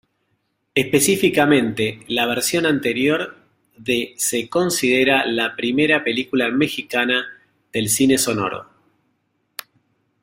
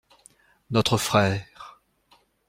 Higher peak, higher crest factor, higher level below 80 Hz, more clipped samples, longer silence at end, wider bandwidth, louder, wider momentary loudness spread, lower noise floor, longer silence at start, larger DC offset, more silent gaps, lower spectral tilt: about the same, -2 dBFS vs -4 dBFS; about the same, 18 dB vs 22 dB; about the same, -58 dBFS vs -56 dBFS; neither; first, 1.6 s vs 0.8 s; about the same, 16 kHz vs 16 kHz; first, -18 LUFS vs -23 LUFS; second, 12 LU vs 24 LU; first, -70 dBFS vs -62 dBFS; about the same, 0.75 s vs 0.7 s; neither; neither; about the same, -3.5 dB/octave vs -4.5 dB/octave